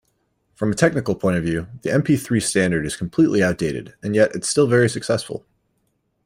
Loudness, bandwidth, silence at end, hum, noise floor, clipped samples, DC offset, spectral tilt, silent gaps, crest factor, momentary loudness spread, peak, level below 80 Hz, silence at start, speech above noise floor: -20 LUFS; 16 kHz; 0.85 s; none; -69 dBFS; under 0.1%; under 0.1%; -5.5 dB/octave; none; 18 dB; 9 LU; -2 dBFS; -50 dBFS; 0.6 s; 50 dB